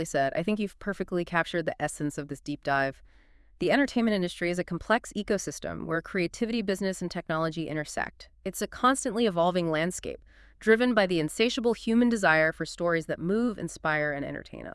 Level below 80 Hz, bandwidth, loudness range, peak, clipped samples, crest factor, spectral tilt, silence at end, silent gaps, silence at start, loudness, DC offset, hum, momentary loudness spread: -54 dBFS; 12 kHz; 5 LU; -8 dBFS; under 0.1%; 20 dB; -5 dB/octave; 0 s; none; 0 s; -28 LUFS; under 0.1%; none; 10 LU